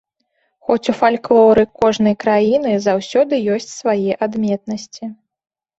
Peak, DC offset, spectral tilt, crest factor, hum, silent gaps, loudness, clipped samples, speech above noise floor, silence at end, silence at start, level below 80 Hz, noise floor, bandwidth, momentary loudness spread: -2 dBFS; under 0.1%; -5.5 dB/octave; 14 dB; none; none; -16 LUFS; under 0.1%; 52 dB; 0.65 s; 0.7 s; -54 dBFS; -67 dBFS; 8 kHz; 14 LU